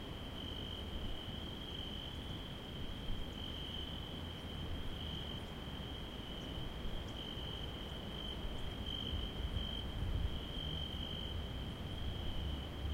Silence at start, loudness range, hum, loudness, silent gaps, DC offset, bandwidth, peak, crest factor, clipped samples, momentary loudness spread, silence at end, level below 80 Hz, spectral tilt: 0 s; 3 LU; none; -44 LUFS; none; under 0.1%; 16 kHz; -26 dBFS; 16 dB; under 0.1%; 4 LU; 0 s; -46 dBFS; -5.5 dB/octave